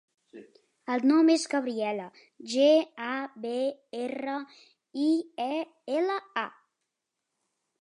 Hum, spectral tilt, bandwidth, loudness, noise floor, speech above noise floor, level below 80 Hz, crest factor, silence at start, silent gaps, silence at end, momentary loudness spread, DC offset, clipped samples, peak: none; -3.5 dB/octave; 11 kHz; -28 LUFS; -85 dBFS; 57 dB; -86 dBFS; 18 dB; 0.35 s; none; 1.35 s; 15 LU; under 0.1%; under 0.1%; -12 dBFS